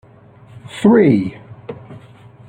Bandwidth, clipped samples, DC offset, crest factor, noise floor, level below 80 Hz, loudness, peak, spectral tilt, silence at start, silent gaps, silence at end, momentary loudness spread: 9.8 kHz; under 0.1%; under 0.1%; 16 dB; -44 dBFS; -54 dBFS; -14 LUFS; -2 dBFS; -8 dB/octave; 0.75 s; none; 0.5 s; 24 LU